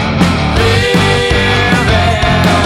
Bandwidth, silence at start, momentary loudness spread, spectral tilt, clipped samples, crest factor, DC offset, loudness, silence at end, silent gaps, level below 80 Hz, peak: 15.5 kHz; 0 s; 2 LU; -5 dB/octave; under 0.1%; 10 dB; under 0.1%; -10 LUFS; 0 s; none; -22 dBFS; 0 dBFS